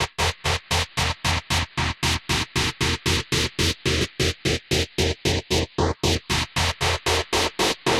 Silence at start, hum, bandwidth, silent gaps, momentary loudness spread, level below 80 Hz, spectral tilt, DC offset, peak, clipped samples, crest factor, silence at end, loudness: 0 s; none; 16.5 kHz; none; 3 LU; -38 dBFS; -3.5 dB/octave; under 0.1%; -8 dBFS; under 0.1%; 16 dB; 0 s; -23 LUFS